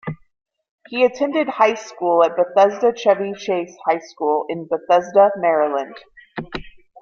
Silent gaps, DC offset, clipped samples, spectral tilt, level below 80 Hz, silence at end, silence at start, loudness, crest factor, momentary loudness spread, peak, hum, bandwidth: 0.69-0.78 s; under 0.1%; under 0.1%; -5 dB/octave; -54 dBFS; 0 s; 0.05 s; -18 LUFS; 18 dB; 17 LU; -2 dBFS; none; 7 kHz